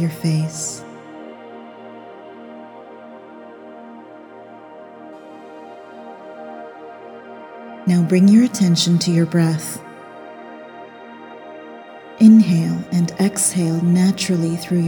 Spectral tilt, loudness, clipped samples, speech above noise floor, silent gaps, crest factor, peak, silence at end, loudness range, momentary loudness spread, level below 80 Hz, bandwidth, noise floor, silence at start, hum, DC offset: -5.5 dB/octave; -16 LUFS; under 0.1%; 24 dB; none; 18 dB; 0 dBFS; 0 s; 22 LU; 25 LU; -64 dBFS; 19 kHz; -39 dBFS; 0 s; none; under 0.1%